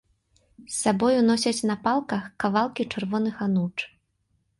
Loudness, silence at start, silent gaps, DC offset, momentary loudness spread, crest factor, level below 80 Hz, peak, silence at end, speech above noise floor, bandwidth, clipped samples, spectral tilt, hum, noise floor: -25 LUFS; 0.6 s; none; under 0.1%; 10 LU; 18 dB; -62 dBFS; -8 dBFS; 0.7 s; 47 dB; 11.5 kHz; under 0.1%; -5 dB/octave; none; -71 dBFS